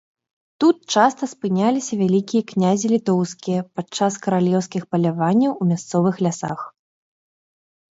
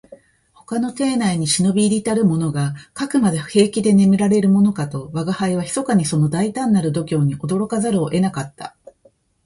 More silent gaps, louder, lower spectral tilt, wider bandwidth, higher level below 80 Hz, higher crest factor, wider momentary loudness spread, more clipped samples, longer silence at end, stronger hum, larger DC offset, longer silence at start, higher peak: neither; about the same, -20 LUFS vs -18 LUFS; about the same, -6 dB/octave vs -6 dB/octave; second, 8 kHz vs 11.5 kHz; second, -66 dBFS vs -54 dBFS; about the same, 20 dB vs 16 dB; second, 7 LU vs 10 LU; neither; first, 1.2 s vs 0.75 s; neither; neither; first, 0.6 s vs 0.1 s; about the same, -2 dBFS vs -2 dBFS